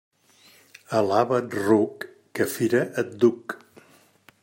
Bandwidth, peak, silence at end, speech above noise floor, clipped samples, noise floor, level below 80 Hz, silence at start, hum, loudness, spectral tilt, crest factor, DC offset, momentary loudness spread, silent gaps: 16.5 kHz; -6 dBFS; 0.85 s; 34 dB; under 0.1%; -57 dBFS; -72 dBFS; 0.9 s; none; -23 LUFS; -6 dB/octave; 18 dB; under 0.1%; 15 LU; none